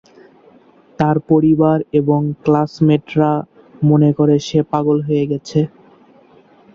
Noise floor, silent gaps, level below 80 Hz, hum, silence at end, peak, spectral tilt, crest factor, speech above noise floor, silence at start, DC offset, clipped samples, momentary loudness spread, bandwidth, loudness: -48 dBFS; none; -52 dBFS; none; 1.05 s; -2 dBFS; -8.5 dB/octave; 14 dB; 34 dB; 1 s; under 0.1%; under 0.1%; 6 LU; 7.4 kHz; -15 LUFS